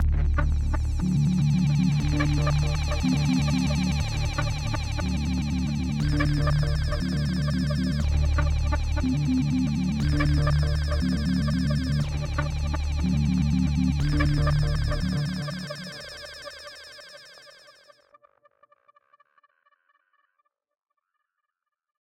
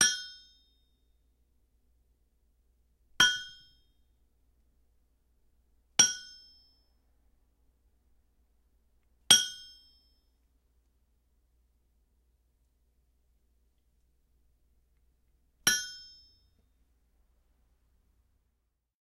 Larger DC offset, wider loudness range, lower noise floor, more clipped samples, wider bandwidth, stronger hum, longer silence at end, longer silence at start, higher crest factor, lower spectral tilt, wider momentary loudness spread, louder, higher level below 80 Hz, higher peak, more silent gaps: neither; first, 9 LU vs 6 LU; first, -84 dBFS vs -80 dBFS; neither; second, 12 kHz vs 16 kHz; neither; first, 4.5 s vs 3.05 s; about the same, 0 s vs 0 s; second, 18 dB vs 34 dB; first, -6.5 dB/octave vs 1.5 dB/octave; second, 9 LU vs 24 LU; about the same, -25 LUFS vs -25 LUFS; first, -30 dBFS vs -68 dBFS; second, -8 dBFS vs -4 dBFS; neither